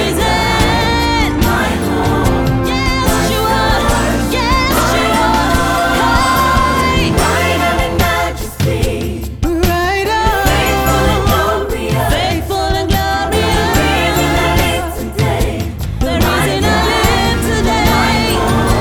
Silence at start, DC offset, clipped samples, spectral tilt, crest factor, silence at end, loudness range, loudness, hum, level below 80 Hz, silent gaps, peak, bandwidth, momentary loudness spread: 0 s; under 0.1%; under 0.1%; -4.5 dB/octave; 12 dB; 0 s; 2 LU; -13 LUFS; none; -20 dBFS; none; 0 dBFS; over 20 kHz; 5 LU